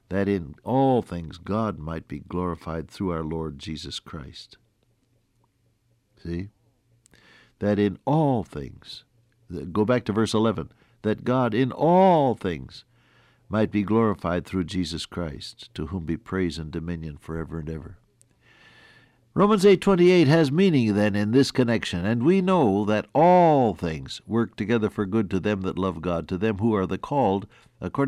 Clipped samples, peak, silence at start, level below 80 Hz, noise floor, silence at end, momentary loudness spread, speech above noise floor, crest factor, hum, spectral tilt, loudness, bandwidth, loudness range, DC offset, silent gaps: under 0.1%; -8 dBFS; 0.1 s; -52 dBFS; -67 dBFS; 0 s; 17 LU; 44 dB; 16 dB; none; -7 dB/octave; -24 LUFS; 12.5 kHz; 13 LU; under 0.1%; none